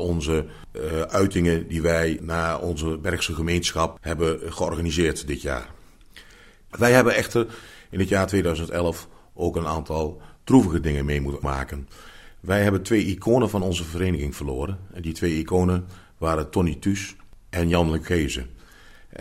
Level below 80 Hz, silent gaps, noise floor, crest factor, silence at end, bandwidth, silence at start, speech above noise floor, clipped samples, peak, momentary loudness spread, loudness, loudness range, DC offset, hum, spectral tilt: -38 dBFS; none; -49 dBFS; 22 dB; 0 s; 16 kHz; 0 s; 26 dB; under 0.1%; -2 dBFS; 12 LU; -24 LUFS; 3 LU; under 0.1%; none; -5.5 dB/octave